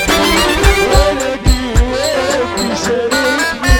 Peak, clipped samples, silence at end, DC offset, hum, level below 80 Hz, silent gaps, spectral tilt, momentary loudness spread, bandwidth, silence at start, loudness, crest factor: 0 dBFS; under 0.1%; 0 s; under 0.1%; none; -18 dBFS; none; -4 dB/octave; 5 LU; 20 kHz; 0 s; -13 LUFS; 12 dB